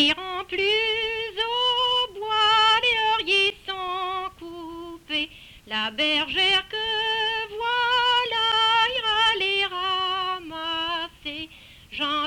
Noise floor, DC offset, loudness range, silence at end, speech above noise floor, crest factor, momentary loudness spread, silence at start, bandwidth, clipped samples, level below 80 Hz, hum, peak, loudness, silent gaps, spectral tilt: -46 dBFS; under 0.1%; 4 LU; 0 s; 23 dB; 16 dB; 13 LU; 0 s; 18 kHz; under 0.1%; -56 dBFS; none; -8 dBFS; -22 LUFS; none; -2 dB/octave